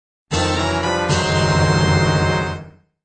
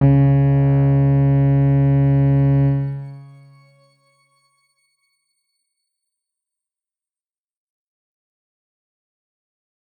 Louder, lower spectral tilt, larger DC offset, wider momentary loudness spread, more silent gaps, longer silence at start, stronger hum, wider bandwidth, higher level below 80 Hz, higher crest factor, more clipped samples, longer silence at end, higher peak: about the same, -18 LUFS vs -16 LUFS; second, -5 dB/octave vs -12.5 dB/octave; neither; about the same, 8 LU vs 8 LU; neither; first, 0.3 s vs 0 s; neither; first, 9.4 kHz vs 3.1 kHz; about the same, -36 dBFS vs -40 dBFS; about the same, 14 dB vs 14 dB; neither; second, 0.35 s vs 6.75 s; about the same, -4 dBFS vs -6 dBFS